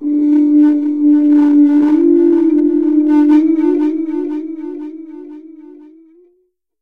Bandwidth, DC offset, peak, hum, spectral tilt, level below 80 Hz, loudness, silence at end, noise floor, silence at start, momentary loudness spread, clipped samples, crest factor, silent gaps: 3.5 kHz; 0.6%; -2 dBFS; none; -7.5 dB/octave; -62 dBFS; -11 LUFS; 1.2 s; -61 dBFS; 0 s; 16 LU; under 0.1%; 10 dB; none